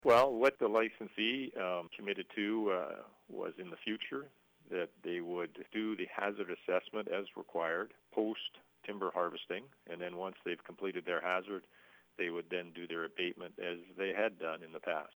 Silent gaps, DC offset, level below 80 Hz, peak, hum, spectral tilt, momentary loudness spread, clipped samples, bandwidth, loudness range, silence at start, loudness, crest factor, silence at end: none; under 0.1%; -80 dBFS; -18 dBFS; none; -5 dB/octave; 10 LU; under 0.1%; over 20 kHz; 4 LU; 0.05 s; -38 LUFS; 20 dB; 0.1 s